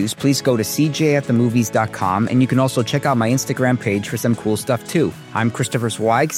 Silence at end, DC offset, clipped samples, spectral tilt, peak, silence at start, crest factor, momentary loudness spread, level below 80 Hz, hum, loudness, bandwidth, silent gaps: 0 s; under 0.1%; under 0.1%; -5.5 dB/octave; -4 dBFS; 0 s; 14 dB; 4 LU; -58 dBFS; none; -18 LUFS; 16.5 kHz; none